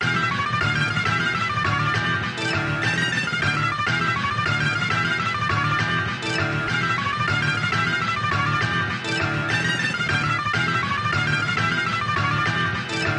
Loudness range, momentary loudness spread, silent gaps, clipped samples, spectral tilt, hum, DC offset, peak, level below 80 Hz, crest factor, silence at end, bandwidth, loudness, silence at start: 0 LU; 2 LU; none; under 0.1%; -4.5 dB/octave; none; under 0.1%; -8 dBFS; -50 dBFS; 14 dB; 0 s; 11.5 kHz; -22 LUFS; 0 s